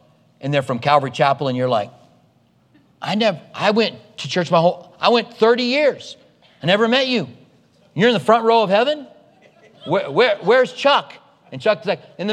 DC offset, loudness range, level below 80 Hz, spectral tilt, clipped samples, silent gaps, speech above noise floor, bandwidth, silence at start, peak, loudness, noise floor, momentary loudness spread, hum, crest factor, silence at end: under 0.1%; 3 LU; -70 dBFS; -5.5 dB/octave; under 0.1%; none; 40 dB; 10.5 kHz; 0.45 s; 0 dBFS; -18 LUFS; -57 dBFS; 14 LU; none; 18 dB; 0 s